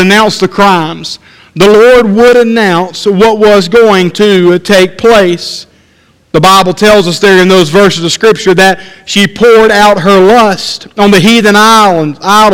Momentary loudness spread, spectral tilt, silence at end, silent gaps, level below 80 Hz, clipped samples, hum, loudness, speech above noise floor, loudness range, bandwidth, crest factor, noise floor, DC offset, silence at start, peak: 9 LU; -4.5 dB/octave; 0 s; none; -36 dBFS; 7%; none; -5 LUFS; 41 dB; 2 LU; 17 kHz; 6 dB; -46 dBFS; under 0.1%; 0 s; 0 dBFS